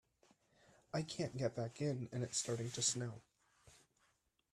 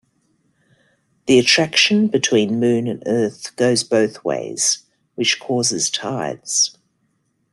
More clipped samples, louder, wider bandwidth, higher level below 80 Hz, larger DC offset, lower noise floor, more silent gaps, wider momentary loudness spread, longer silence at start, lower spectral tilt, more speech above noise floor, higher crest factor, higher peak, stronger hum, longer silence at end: neither; second, -41 LUFS vs -17 LUFS; about the same, 13.5 kHz vs 12.5 kHz; second, -76 dBFS vs -62 dBFS; neither; first, -80 dBFS vs -67 dBFS; neither; about the same, 8 LU vs 10 LU; second, 0.95 s vs 1.25 s; about the same, -4 dB/octave vs -3 dB/octave; second, 38 dB vs 49 dB; about the same, 22 dB vs 18 dB; second, -22 dBFS vs -2 dBFS; neither; about the same, 0.75 s vs 0.8 s